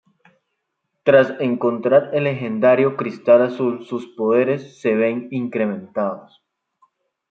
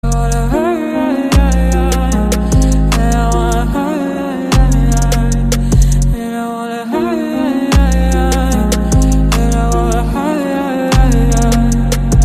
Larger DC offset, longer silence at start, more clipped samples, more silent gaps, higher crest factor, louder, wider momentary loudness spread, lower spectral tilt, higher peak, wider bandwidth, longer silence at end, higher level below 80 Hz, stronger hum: neither; first, 1.05 s vs 0.05 s; neither; neither; first, 18 dB vs 10 dB; second, -19 LUFS vs -13 LUFS; first, 10 LU vs 5 LU; first, -8 dB/octave vs -6 dB/octave; about the same, -2 dBFS vs 0 dBFS; second, 6.8 kHz vs 15 kHz; first, 1.1 s vs 0 s; second, -70 dBFS vs -14 dBFS; neither